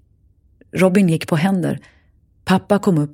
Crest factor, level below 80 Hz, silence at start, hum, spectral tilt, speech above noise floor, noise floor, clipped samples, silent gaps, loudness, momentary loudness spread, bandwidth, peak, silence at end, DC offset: 16 dB; -54 dBFS; 0.75 s; none; -7 dB/octave; 39 dB; -55 dBFS; under 0.1%; none; -17 LUFS; 14 LU; 16 kHz; -2 dBFS; 0.05 s; under 0.1%